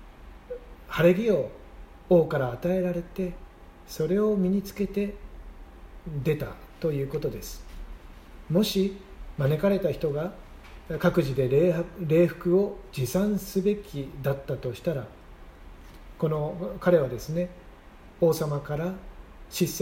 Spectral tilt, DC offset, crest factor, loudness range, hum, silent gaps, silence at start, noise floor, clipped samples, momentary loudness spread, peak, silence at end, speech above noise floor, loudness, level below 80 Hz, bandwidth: -6.5 dB/octave; under 0.1%; 20 dB; 6 LU; none; none; 0 s; -49 dBFS; under 0.1%; 19 LU; -8 dBFS; 0 s; 23 dB; -27 LUFS; -46 dBFS; 16.5 kHz